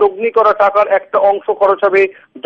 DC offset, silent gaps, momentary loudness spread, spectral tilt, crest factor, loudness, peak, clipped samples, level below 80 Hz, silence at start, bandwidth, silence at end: under 0.1%; none; 3 LU; -6 dB/octave; 12 dB; -12 LUFS; 0 dBFS; under 0.1%; -56 dBFS; 0 s; 6.2 kHz; 0.05 s